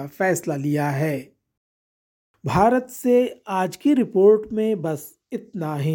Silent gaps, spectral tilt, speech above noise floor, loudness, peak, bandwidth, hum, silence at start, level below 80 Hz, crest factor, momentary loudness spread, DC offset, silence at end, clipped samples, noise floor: 1.57-2.34 s; -6.5 dB/octave; over 69 dB; -21 LUFS; -4 dBFS; 17 kHz; none; 0 s; -54 dBFS; 18 dB; 15 LU; under 0.1%; 0 s; under 0.1%; under -90 dBFS